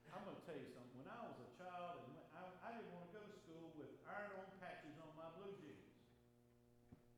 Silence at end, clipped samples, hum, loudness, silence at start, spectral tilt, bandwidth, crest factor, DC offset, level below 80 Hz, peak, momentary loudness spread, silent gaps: 0 s; under 0.1%; none; -57 LUFS; 0 s; -6.5 dB/octave; 13 kHz; 20 dB; under 0.1%; -84 dBFS; -38 dBFS; 7 LU; none